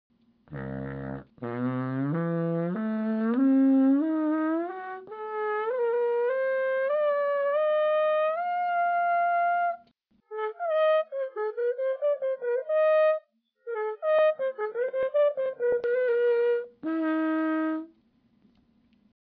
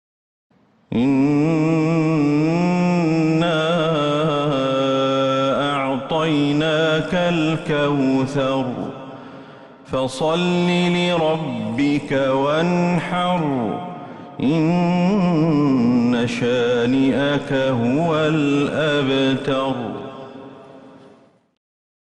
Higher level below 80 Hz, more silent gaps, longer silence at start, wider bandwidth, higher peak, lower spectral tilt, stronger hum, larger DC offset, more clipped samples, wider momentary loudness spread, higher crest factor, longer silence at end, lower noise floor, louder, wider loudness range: second, -66 dBFS vs -52 dBFS; neither; second, 0.5 s vs 0.9 s; second, 4.8 kHz vs 10.5 kHz; second, -16 dBFS vs -8 dBFS; first, -10.5 dB/octave vs -6.5 dB/octave; neither; neither; neither; first, 12 LU vs 9 LU; about the same, 12 dB vs 12 dB; first, 1.35 s vs 1.2 s; first, -66 dBFS vs -51 dBFS; second, -27 LUFS vs -19 LUFS; about the same, 3 LU vs 3 LU